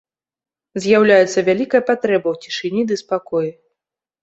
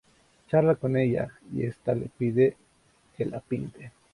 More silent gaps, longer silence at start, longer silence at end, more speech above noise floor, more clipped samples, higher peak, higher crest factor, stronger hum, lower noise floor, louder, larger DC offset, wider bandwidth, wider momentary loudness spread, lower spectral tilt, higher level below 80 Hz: neither; first, 0.75 s vs 0.5 s; first, 0.7 s vs 0.25 s; first, 66 dB vs 37 dB; neither; first, -2 dBFS vs -10 dBFS; about the same, 16 dB vs 18 dB; neither; first, -83 dBFS vs -64 dBFS; first, -17 LUFS vs -27 LUFS; neither; second, 8.2 kHz vs 11 kHz; about the same, 12 LU vs 11 LU; second, -5 dB/octave vs -9.5 dB/octave; about the same, -62 dBFS vs -60 dBFS